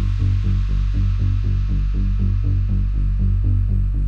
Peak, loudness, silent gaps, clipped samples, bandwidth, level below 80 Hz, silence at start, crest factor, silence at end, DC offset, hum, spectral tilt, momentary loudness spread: -8 dBFS; -21 LUFS; none; under 0.1%; 5 kHz; -20 dBFS; 0 s; 8 dB; 0 s; under 0.1%; none; -9 dB/octave; 2 LU